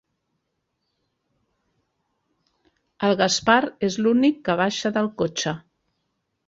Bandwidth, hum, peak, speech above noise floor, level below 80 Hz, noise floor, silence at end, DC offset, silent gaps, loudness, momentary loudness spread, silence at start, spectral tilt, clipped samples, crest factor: 7.8 kHz; none; -2 dBFS; 55 dB; -62 dBFS; -76 dBFS; 0.9 s; under 0.1%; none; -21 LUFS; 7 LU; 3 s; -4 dB/octave; under 0.1%; 22 dB